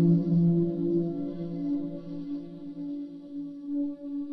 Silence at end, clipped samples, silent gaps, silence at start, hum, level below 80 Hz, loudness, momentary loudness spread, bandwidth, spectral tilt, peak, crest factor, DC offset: 0 s; under 0.1%; none; 0 s; none; -62 dBFS; -30 LUFS; 15 LU; 4.6 kHz; -12.5 dB/octave; -14 dBFS; 16 dB; under 0.1%